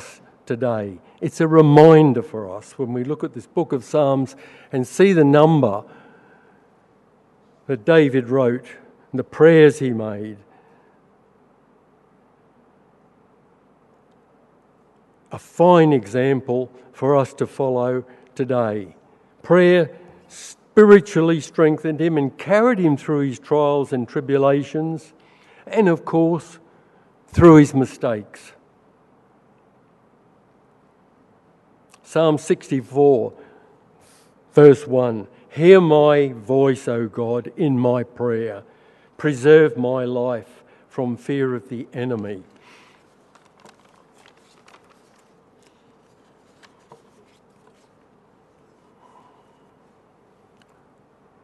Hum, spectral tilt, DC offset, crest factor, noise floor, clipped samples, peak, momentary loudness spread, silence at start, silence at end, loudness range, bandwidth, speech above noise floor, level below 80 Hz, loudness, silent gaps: none; -7.5 dB/octave; under 0.1%; 20 dB; -56 dBFS; under 0.1%; 0 dBFS; 18 LU; 0 s; 9.05 s; 10 LU; 11.5 kHz; 39 dB; -54 dBFS; -17 LUFS; none